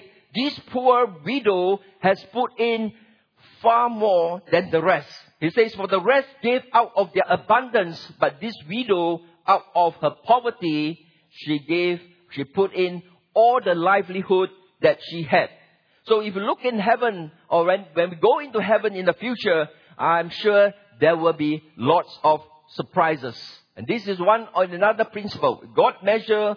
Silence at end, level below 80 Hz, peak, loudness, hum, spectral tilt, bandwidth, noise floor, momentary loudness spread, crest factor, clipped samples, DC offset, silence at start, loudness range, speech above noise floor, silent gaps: 0 s; -70 dBFS; -4 dBFS; -22 LUFS; none; -7 dB/octave; 5.4 kHz; -56 dBFS; 9 LU; 18 dB; under 0.1%; under 0.1%; 0.35 s; 2 LU; 35 dB; none